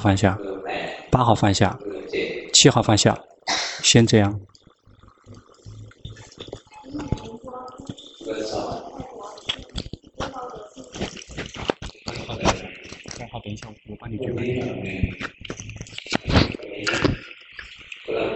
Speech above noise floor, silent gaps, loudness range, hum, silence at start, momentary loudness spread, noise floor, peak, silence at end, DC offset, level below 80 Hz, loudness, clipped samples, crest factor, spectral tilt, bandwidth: 33 dB; none; 14 LU; none; 0 s; 21 LU; -53 dBFS; -2 dBFS; 0 s; under 0.1%; -42 dBFS; -22 LUFS; under 0.1%; 22 dB; -4 dB/octave; 8.4 kHz